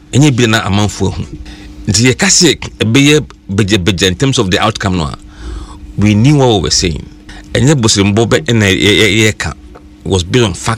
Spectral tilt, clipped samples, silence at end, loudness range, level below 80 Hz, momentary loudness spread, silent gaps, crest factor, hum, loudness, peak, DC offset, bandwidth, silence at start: -4 dB/octave; under 0.1%; 0 s; 3 LU; -30 dBFS; 18 LU; none; 12 dB; none; -10 LUFS; 0 dBFS; 0.1%; 16.5 kHz; 0.1 s